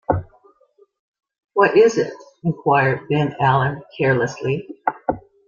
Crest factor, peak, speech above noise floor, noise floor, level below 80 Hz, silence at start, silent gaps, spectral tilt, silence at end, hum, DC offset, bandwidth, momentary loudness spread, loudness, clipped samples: 18 dB; -2 dBFS; 39 dB; -57 dBFS; -50 dBFS; 0.1 s; 0.99-1.14 s; -6.5 dB/octave; 0.3 s; none; under 0.1%; 7.4 kHz; 11 LU; -19 LUFS; under 0.1%